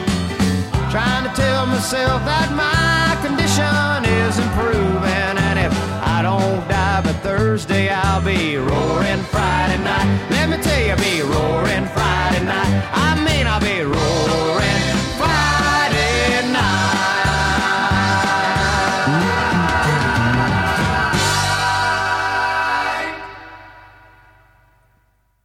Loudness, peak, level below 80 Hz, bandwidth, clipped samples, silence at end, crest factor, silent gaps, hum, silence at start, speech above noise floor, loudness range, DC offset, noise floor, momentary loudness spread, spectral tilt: -17 LUFS; -2 dBFS; -30 dBFS; 16.5 kHz; under 0.1%; 1.6 s; 14 dB; none; none; 0 s; 43 dB; 2 LU; under 0.1%; -60 dBFS; 3 LU; -4.5 dB/octave